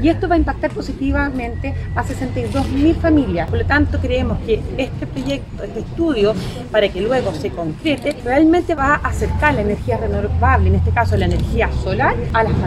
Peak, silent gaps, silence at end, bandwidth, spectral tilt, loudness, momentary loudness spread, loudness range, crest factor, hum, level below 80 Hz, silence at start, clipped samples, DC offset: 0 dBFS; none; 0 s; 12 kHz; -7 dB/octave; -18 LUFS; 8 LU; 3 LU; 16 dB; none; -26 dBFS; 0 s; under 0.1%; under 0.1%